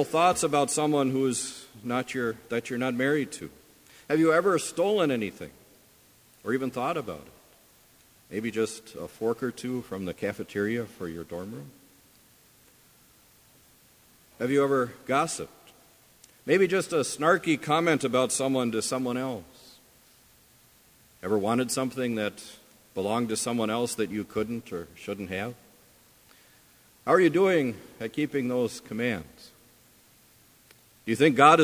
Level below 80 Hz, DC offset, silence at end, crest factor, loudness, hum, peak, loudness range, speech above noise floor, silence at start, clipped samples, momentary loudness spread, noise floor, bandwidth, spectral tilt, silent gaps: -64 dBFS; under 0.1%; 0 s; 24 dB; -27 LUFS; none; -4 dBFS; 9 LU; 32 dB; 0 s; under 0.1%; 16 LU; -59 dBFS; 16 kHz; -4.5 dB/octave; none